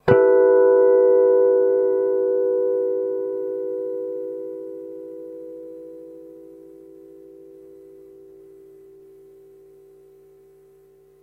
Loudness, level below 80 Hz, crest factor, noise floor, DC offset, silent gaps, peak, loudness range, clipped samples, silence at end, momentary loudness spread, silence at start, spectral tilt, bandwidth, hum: -19 LUFS; -60 dBFS; 22 dB; -53 dBFS; under 0.1%; none; 0 dBFS; 25 LU; under 0.1%; 4.8 s; 23 LU; 0.05 s; -9.5 dB/octave; 3.8 kHz; none